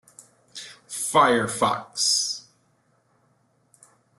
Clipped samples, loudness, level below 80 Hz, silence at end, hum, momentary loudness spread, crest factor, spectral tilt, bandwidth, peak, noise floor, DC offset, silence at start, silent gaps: under 0.1%; -22 LUFS; -66 dBFS; 1.8 s; none; 21 LU; 22 dB; -2 dB/octave; 12.5 kHz; -4 dBFS; -66 dBFS; under 0.1%; 0.55 s; none